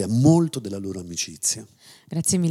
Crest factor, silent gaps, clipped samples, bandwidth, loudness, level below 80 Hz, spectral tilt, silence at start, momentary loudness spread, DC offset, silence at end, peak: 18 dB; none; under 0.1%; 16 kHz; -23 LUFS; -58 dBFS; -5 dB/octave; 0 s; 14 LU; under 0.1%; 0 s; -4 dBFS